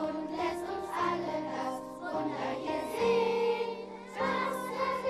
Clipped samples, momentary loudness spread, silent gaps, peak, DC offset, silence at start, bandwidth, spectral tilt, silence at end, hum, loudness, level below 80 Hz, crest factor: under 0.1%; 9 LU; none; -18 dBFS; under 0.1%; 0 s; 14.5 kHz; -5 dB/octave; 0 s; none; -33 LUFS; -64 dBFS; 16 dB